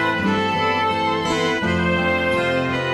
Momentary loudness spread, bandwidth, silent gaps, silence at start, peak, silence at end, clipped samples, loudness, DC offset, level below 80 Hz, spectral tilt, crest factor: 1 LU; 13.5 kHz; none; 0 s; -8 dBFS; 0 s; under 0.1%; -19 LUFS; under 0.1%; -46 dBFS; -5.5 dB/octave; 12 dB